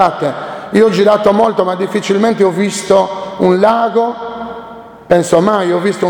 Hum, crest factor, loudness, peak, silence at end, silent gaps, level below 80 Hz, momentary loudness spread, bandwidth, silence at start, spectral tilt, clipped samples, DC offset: none; 12 dB; -12 LUFS; 0 dBFS; 0 s; none; -50 dBFS; 14 LU; 18.5 kHz; 0 s; -5.5 dB/octave; 0.2%; under 0.1%